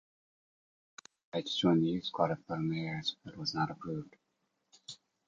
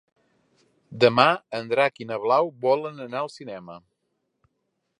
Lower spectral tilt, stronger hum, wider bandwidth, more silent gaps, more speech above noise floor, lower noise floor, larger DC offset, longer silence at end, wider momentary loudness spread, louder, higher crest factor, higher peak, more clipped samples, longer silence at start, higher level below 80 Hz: about the same, -6 dB/octave vs -5.5 dB/octave; neither; second, 7.8 kHz vs 10.5 kHz; neither; second, 47 dB vs 53 dB; first, -81 dBFS vs -76 dBFS; neither; second, 0.35 s vs 1.2 s; first, 24 LU vs 20 LU; second, -34 LUFS vs -23 LUFS; about the same, 22 dB vs 24 dB; second, -14 dBFS vs 0 dBFS; neither; first, 1.35 s vs 0.9 s; about the same, -68 dBFS vs -70 dBFS